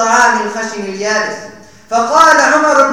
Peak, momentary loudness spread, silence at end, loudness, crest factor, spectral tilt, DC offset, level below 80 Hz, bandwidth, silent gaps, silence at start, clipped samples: 0 dBFS; 13 LU; 0 s; -11 LUFS; 12 dB; -2 dB/octave; 0.5%; -54 dBFS; 19.5 kHz; none; 0 s; 0.8%